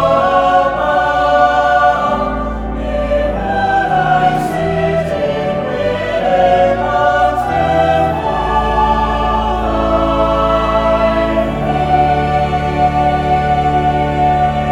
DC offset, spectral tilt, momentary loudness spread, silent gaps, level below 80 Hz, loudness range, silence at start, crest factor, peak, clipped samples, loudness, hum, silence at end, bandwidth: under 0.1%; -6.5 dB/octave; 5 LU; none; -26 dBFS; 2 LU; 0 s; 12 dB; 0 dBFS; under 0.1%; -14 LUFS; none; 0 s; 12.5 kHz